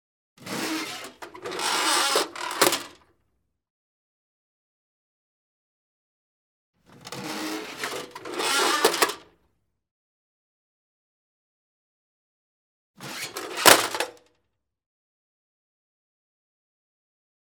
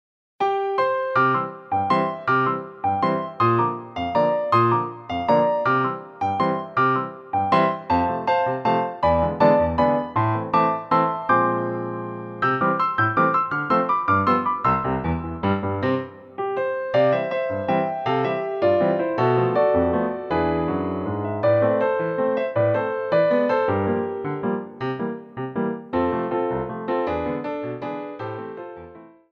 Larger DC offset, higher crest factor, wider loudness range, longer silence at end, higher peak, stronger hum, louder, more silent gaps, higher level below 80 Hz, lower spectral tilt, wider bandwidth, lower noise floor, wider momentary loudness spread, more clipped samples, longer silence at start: neither; first, 30 dB vs 18 dB; first, 15 LU vs 5 LU; first, 3.4 s vs 0.25 s; first, 0 dBFS vs -4 dBFS; neither; about the same, -23 LUFS vs -22 LUFS; first, 3.70-6.73 s, 9.91-12.94 s vs none; second, -72 dBFS vs -48 dBFS; second, -0.5 dB/octave vs -8.5 dB/octave; first, 19.5 kHz vs 6.8 kHz; first, -78 dBFS vs -44 dBFS; first, 20 LU vs 9 LU; neither; about the same, 0.4 s vs 0.4 s